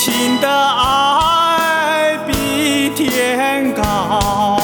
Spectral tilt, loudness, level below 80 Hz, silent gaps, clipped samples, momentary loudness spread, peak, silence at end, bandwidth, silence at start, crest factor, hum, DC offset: -3 dB/octave; -14 LUFS; -34 dBFS; none; under 0.1%; 4 LU; 0 dBFS; 0 s; 19.5 kHz; 0 s; 14 dB; none; under 0.1%